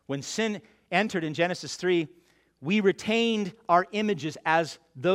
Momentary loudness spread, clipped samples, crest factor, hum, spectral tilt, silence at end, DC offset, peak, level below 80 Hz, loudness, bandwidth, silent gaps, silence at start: 7 LU; under 0.1%; 20 dB; none; -5 dB/octave; 0 s; under 0.1%; -8 dBFS; -70 dBFS; -27 LUFS; 14 kHz; none; 0.1 s